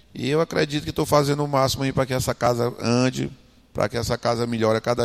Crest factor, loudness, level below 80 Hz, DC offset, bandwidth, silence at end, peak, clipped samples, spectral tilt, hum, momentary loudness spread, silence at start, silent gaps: 18 dB; -23 LUFS; -46 dBFS; under 0.1%; 15.5 kHz; 0 s; -4 dBFS; under 0.1%; -5.5 dB/octave; none; 5 LU; 0.15 s; none